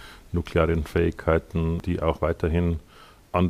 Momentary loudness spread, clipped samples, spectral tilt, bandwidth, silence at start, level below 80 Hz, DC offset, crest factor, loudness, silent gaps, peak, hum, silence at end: 6 LU; under 0.1%; -8 dB/octave; 13.5 kHz; 0 s; -36 dBFS; under 0.1%; 18 dB; -25 LUFS; none; -6 dBFS; none; 0 s